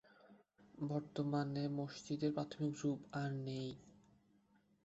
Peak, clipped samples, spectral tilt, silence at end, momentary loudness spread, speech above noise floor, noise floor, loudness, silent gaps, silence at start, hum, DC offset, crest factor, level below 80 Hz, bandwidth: -26 dBFS; under 0.1%; -7 dB/octave; 0.85 s; 7 LU; 33 dB; -74 dBFS; -42 LUFS; none; 0.25 s; none; under 0.1%; 18 dB; -78 dBFS; 8 kHz